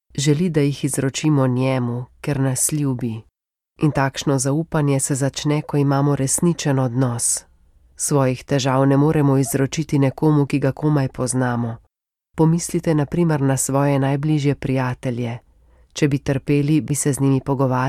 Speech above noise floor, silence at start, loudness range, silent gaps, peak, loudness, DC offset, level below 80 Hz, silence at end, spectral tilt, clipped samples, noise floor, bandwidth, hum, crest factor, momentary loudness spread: 53 dB; 0.15 s; 3 LU; none; -4 dBFS; -19 LUFS; under 0.1%; -48 dBFS; 0 s; -5.5 dB/octave; under 0.1%; -72 dBFS; 15.5 kHz; none; 14 dB; 7 LU